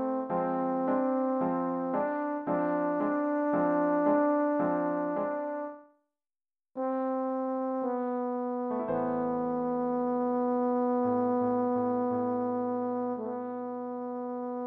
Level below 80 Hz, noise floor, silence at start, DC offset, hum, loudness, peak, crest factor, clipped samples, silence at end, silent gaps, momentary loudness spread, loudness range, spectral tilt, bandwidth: -70 dBFS; under -90 dBFS; 0 s; under 0.1%; none; -30 LUFS; -16 dBFS; 14 dB; under 0.1%; 0 s; none; 9 LU; 5 LU; -10.5 dB/octave; 3.4 kHz